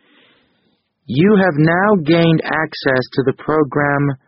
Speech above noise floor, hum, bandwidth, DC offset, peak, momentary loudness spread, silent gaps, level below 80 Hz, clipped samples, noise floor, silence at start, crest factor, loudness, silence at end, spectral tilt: 49 dB; none; 5.8 kHz; under 0.1%; 0 dBFS; 7 LU; none; -50 dBFS; under 0.1%; -63 dBFS; 1.1 s; 16 dB; -15 LUFS; 0.1 s; -5.5 dB/octave